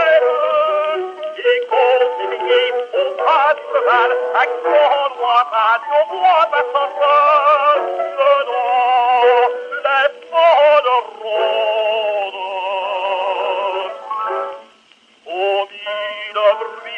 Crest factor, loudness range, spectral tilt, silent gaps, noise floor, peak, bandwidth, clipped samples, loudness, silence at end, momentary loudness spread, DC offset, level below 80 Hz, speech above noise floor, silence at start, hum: 12 dB; 7 LU; -2 dB/octave; none; -51 dBFS; -2 dBFS; 7.8 kHz; under 0.1%; -16 LUFS; 0 s; 10 LU; under 0.1%; -78 dBFS; 36 dB; 0 s; none